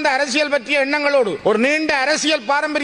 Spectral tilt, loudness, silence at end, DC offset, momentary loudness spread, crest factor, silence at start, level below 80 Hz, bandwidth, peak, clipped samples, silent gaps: -2.5 dB/octave; -17 LUFS; 0 s; under 0.1%; 2 LU; 14 dB; 0 s; -58 dBFS; 11 kHz; -4 dBFS; under 0.1%; none